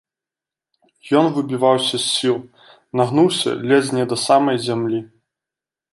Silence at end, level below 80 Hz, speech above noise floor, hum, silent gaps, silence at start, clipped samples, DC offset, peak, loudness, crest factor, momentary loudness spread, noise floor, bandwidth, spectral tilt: 0.85 s; -66 dBFS; 71 dB; none; none; 1.05 s; under 0.1%; under 0.1%; -2 dBFS; -18 LUFS; 18 dB; 7 LU; -89 dBFS; 11.5 kHz; -4.5 dB/octave